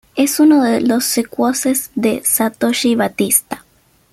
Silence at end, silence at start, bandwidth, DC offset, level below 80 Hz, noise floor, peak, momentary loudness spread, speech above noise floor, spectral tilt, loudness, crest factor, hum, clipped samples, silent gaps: 0.55 s; 0.15 s; 16 kHz; under 0.1%; -56 dBFS; -54 dBFS; 0 dBFS; 6 LU; 40 dB; -3 dB/octave; -15 LUFS; 16 dB; none; under 0.1%; none